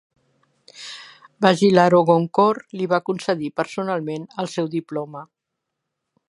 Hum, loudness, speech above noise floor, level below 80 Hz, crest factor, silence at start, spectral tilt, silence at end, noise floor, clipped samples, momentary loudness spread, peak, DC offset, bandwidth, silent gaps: none; -20 LUFS; 61 dB; -66 dBFS; 20 dB; 0.8 s; -6 dB/octave; 1.05 s; -81 dBFS; under 0.1%; 21 LU; 0 dBFS; under 0.1%; 11.5 kHz; none